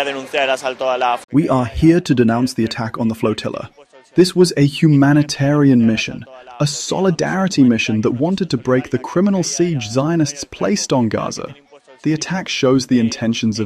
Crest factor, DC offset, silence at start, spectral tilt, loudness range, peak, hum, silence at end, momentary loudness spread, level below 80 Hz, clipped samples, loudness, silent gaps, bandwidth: 16 dB; under 0.1%; 0 s; -5.5 dB/octave; 4 LU; 0 dBFS; none; 0 s; 9 LU; -44 dBFS; under 0.1%; -16 LUFS; 1.24-1.28 s; 13.5 kHz